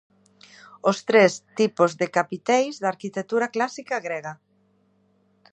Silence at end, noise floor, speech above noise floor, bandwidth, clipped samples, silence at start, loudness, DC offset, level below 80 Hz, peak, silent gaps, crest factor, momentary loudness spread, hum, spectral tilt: 1.2 s; -64 dBFS; 42 dB; 8.8 kHz; under 0.1%; 0.85 s; -23 LUFS; under 0.1%; -78 dBFS; -4 dBFS; none; 22 dB; 12 LU; none; -4.5 dB/octave